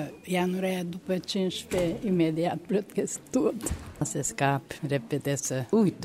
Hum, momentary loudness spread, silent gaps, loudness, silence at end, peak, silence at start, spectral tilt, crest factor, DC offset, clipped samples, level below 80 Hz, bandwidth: none; 6 LU; none; -29 LUFS; 0 s; -10 dBFS; 0 s; -5 dB/octave; 20 dB; under 0.1%; under 0.1%; -50 dBFS; 16 kHz